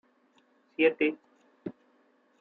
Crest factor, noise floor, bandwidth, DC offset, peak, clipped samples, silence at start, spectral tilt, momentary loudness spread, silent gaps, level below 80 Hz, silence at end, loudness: 22 dB; -67 dBFS; 4.4 kHz; under 0.1%; -12 dBFS; under 0.1%; 0.8 s; -7.5 dB/octave; 20 LU; none; -80 dBFS; 0.7 s; -27 LUFS